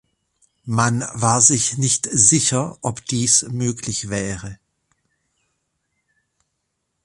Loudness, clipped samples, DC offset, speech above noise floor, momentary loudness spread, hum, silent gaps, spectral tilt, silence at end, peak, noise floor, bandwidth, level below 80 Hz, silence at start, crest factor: -17 LUFS; under 0.1%; under 0.1%; 56 dB; 14 LU; none; none; -3 dB/octave; 2.5 s; 0 dBFS; -75 dBFS; 11.5 kHz; -52 dBFS; 0.65 s; 22 dB